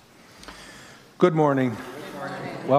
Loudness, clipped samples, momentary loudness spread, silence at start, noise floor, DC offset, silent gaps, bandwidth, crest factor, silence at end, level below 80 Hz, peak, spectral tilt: -24 LUFS; under 0.1%; 23 LU; 0.4 s; -47 dBFS; under 0.1%; none; 15 kHz; 22 dB; 0 s; -62 dBFS; -4 dBFS; -7 dB/octave